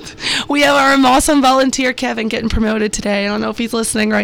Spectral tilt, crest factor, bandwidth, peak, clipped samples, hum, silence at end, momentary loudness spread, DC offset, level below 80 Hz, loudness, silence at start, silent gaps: -3.5 dB/octave; 8 dB; over 20 kHz; -6 dBFS; under 0.1%; none; 0 s; 8 LU; under 0.1%; -32 dBFS; -14 LUFS; 0 s; none